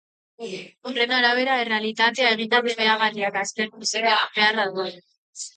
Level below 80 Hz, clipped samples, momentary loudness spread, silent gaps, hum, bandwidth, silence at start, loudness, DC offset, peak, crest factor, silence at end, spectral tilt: -78 dBFS; under 0.1%; 16 LU; 5.18-5.33 s; none; 9.4 kHz; 0.4 s; -21 LUFS; under 0.1%; -4 dBFS; 20 dB; 0.1 s; -1.5 dB/octave